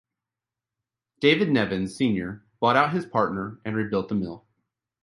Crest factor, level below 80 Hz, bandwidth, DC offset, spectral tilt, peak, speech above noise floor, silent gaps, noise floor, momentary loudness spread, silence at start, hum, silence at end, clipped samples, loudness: 20 dB; -58 dBFS; 11.5 kHz; under 0.1%; -6.5 dB/octave; -6 dBFS; 65 dB; none; -89 dBFS; 10 LU; 1.2 s; none; 0.65 s; under 0.1%; -24 LUFS